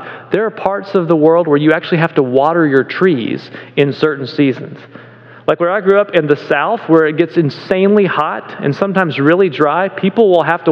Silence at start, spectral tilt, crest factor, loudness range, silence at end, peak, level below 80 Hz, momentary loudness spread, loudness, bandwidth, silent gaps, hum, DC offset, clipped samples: 0 s; -8.5 dB/octave; 12 dB; 3 LU; 0 s; 0 dBFS; -58 dBFS; 8 LU; -13 LUFS; 6.6 kHz; none; none; under 0.1%; 0.2%